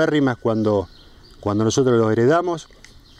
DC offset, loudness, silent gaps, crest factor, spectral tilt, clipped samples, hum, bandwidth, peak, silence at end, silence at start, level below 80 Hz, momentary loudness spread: under 0.1%; -19 LUFS; none; 14 dB; -6 dB/octave; under 0.1%; none; 11 kHz; -6 dBFS; 0.55 s; 0 s; -50 dBFS; 12 LU